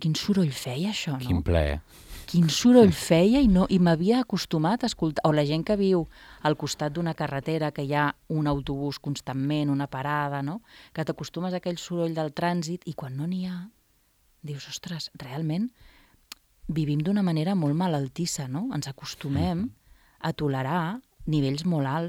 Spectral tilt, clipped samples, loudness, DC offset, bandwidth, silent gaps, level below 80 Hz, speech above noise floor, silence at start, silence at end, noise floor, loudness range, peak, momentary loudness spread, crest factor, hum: -6 dB/octave; under 0.1%; -26 LUFS; under 0.1%; 16.5 kHz; none; -46 dBFS; 40 dB; 0 s; 0 s; -65 dBFS; 11 LU; -4 dBFS; 14 LU; 22 dB; none